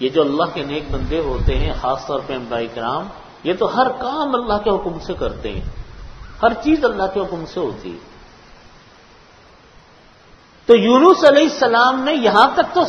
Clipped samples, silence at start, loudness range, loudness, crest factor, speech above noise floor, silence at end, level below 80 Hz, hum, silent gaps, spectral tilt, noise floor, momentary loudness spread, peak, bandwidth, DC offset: under 0.1%; 0 s; 10 LU; -17 LUFS; 18 dB; 31 dB; 0 s; -32 dBFS; none; none; -5.5 dB/octave; -47 dBFS; 16 LU; 0 dBFS; 9.2 kHz; under 0.1%